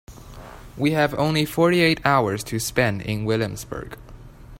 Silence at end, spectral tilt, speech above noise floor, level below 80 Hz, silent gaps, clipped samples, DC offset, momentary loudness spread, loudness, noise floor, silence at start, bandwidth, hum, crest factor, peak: 0 s; -5 dB/octave; 20 dB; -46 dBFS; none; under 0.1%; under 0.1%; 23 LU; -21 LUFS; -42 dBFS; 0.1 s; 16.5 kHz; none; 20 dB; -4 dBFS